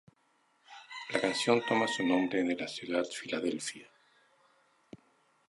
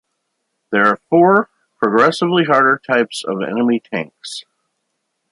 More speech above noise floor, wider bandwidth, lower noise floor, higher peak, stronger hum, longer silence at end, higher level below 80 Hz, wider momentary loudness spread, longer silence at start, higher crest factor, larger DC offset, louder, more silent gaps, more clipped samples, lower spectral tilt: second, 40 dB vs 57 dB; about the same, 11.5 kHz vs 11.5 kHz; about the same, -72 dBFS vs -72 dBFS; second, -12 dBFS vs 0 dBFS; neither; first, 1.65 s vs 0.9 s; second, -76 dBFS vs -66 dBFS; about the same, 15 LU vs 15 LU; about the same, 0.7 s vs 0.7 s; first, 22 dB vs 16 dB; neither; second, -32 LUFS vs -15 LUFS; neither; neither; second, -3.5 dB/octave vs -5.5 dB/octave